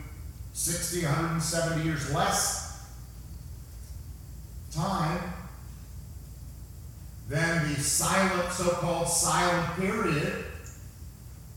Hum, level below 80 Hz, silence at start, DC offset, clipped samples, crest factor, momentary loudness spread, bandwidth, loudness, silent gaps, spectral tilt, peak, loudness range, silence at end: none; -46 dBFS; 0 s; under 0.1%; under 0.1%; 20 dB; 20 LU; 18 kHz; -28 LUFS; none; -3.5 dB/octave; -10 dBFS; 10 LU; 0 s